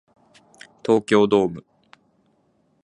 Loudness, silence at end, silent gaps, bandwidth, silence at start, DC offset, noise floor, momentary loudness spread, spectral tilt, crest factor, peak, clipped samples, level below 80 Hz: -20 LUFS; 1.25 s; none; 10.5 kHz; 0.85 s; under 0.1%; -64 dBFS; 15 LU; -6 dB/octave; 20 dB; -4 dBFS; under 0.1%; -60 dBFS